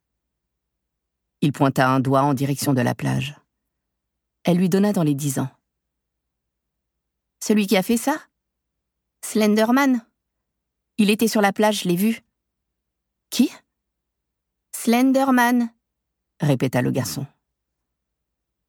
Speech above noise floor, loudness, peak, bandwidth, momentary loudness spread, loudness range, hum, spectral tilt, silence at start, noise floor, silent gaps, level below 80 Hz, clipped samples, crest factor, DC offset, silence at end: 61 dB; -20 LUFS; -4 dBFS; 19 kHz; 12 LU; 4 LU; none; -5.5 dB/octave; 1.4 s; -80 dBFS; none; -64 dBFS; under 0.1%; 18 dB; under 0.1%; 1.4 s